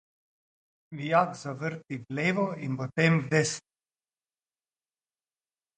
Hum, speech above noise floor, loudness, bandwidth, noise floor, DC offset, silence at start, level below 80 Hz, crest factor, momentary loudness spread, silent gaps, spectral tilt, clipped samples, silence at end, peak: none; over 62 dB; -28 LUFS; 9.4 kHz; under -90 dBFS; under 0.1%; 0.9 s; -72 dBFS; 22 dB; 14 LU; none; -5.5 dB/octave; under 0.1%; 2.2 s; -10 dBFS